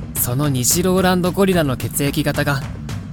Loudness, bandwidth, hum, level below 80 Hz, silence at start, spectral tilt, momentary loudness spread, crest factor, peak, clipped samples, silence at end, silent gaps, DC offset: -17 LUFS; 19 kHz; none; -36 dBFS; 0 s; -4.5 dB/octave; 7 LU; 16 dB; -2 dBFS; under 0.1%; 0 s; none; under 0.1%